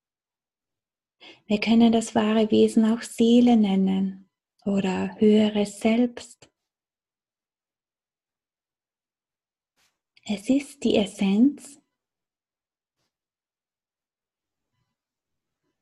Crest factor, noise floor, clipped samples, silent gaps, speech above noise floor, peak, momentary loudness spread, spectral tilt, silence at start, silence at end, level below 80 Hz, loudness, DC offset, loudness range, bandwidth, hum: 18 dB; under -90 dBFS; under 0.1%; none; over 69 dB; -8 dBFS; 10 LU; -6 dB/octave; 1.5 s; 4.15 s; -64 dBFS; -22 LUFS; under 0.1%; 10 LU; 12 kHz; none